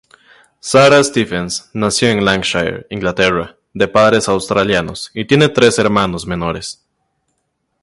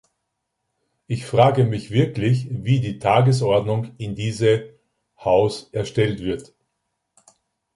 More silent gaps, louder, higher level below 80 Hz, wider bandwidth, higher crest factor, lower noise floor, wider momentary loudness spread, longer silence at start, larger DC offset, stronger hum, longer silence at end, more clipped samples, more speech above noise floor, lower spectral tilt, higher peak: neither; first, -14 LUFS vs -21 LUFS; first, -42 dBFS vs -52 dBFS; about the same, 11.5 kHz vs 11.5 kHz; second, 14 dB vs 20 dB; second, -69 dBFS vs -77 dBFS; about the same, 12 LU vs 12 LU; second, 0.65 s vs 1.1 s; neither; neither; second, 1.1 s vs 1.3 s; neither; about the same, 55 dB vs 58 dB; second, -4.5 dB/octave vs -7 dB/octave; about the same, 0 dBFS vs -2 dBFS